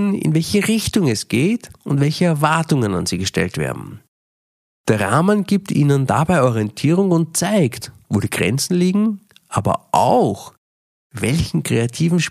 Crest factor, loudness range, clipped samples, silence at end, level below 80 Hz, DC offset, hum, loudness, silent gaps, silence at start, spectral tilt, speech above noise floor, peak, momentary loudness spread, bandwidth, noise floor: 16 dB; 3 LU; under 0.1%; 0 s; -46 dBFS; under 0.1%; none; -18 LUFS; 4.08-4.84 s, 10.58-11.10 s; 0 s; -5.5 dB/octave; over 73 dB; -2 dBFS; 8 LU; 15.5 kHz; under -90 dBFS